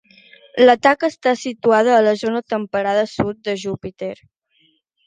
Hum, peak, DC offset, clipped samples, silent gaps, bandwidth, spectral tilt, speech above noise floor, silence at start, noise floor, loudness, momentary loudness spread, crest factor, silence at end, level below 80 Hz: none; -2 dBFS; under 0.1%; under 0.1%; none; 9.4 kHz; -5 dB/octave; 44 dB; 0.55 s; -61 dBFS; -17 LUFS; 15 LU; 18 dB; 0.9 s; -56 dBFS